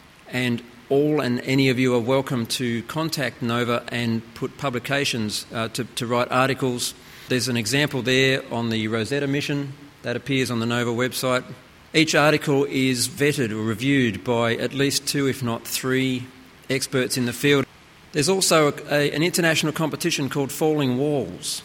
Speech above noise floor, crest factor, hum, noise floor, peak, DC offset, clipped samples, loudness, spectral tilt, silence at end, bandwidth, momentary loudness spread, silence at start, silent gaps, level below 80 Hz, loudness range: 26 dB; 20 dB; none; -48 dBFS; -4 dBFS; under 0.1%; under 0.1%; -22 LUFS; -4.5 dB/octave; 0 s; 16.5 kHz; 9 LU; 0.25 s; none; -58 dBFS; 4 LU